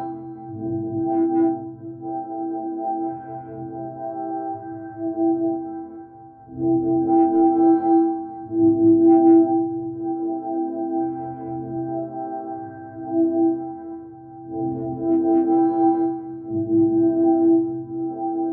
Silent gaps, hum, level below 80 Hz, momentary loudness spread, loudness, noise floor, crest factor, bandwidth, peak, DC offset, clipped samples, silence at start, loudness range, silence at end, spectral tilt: none; none; -62 dBFS; 17 LU; -21 LUFS; -43 dBFS; 14 dB; 1.7 kHz; -6 dBFS; under 0.1%; under 0.1%; 0 s; 10 LU; 0 s; -12 dB/octave